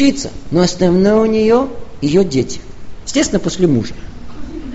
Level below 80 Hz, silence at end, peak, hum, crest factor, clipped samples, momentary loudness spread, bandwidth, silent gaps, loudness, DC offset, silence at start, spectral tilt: -34 dBFS; 0 s; 0 dBFS; none; 14 dB; under 0.1%; 18 LU; 8.2 kHz; none; -15 LUFS; under 0.1%; 0 s; -5.5 dB/octave